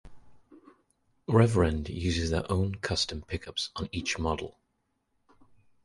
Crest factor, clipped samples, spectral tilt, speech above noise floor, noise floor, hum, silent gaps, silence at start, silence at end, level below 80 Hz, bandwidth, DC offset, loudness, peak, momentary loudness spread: 22 dB; under 0.1%; -5.5 dB/octave; 49 dB; -77 dBFS; none; none; 0.05 s; 1.35 s; -42 dBFS; 11.5 kHz; under 0.1%; -29 LUFS; -10 dBFS; 11 LU